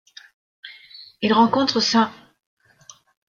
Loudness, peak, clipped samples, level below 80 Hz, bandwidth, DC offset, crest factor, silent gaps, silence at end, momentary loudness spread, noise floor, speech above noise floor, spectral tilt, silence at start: -19 LUFS; -4 dBFS; under 0.1%; -64 dBFS; 7.4 kHz; under 0.1%; 20 dB; none; 1.25 s; 25 LU; -50 dBFS; 32 dB; -4 dB/octave; 0.65 s